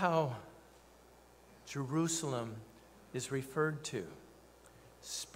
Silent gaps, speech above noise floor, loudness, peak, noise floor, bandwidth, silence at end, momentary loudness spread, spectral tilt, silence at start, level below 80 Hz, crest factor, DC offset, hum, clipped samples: none; 25 dB; -38 LUFS; -18 dBFS; -61 dBFS; 16 kHz; 0 s; 25 LU; -4.5 dB/octave; 0 s; -70 dBFS; 22 dB; under 0.1%; 60 Hz at -65 dBFS; under 0.1%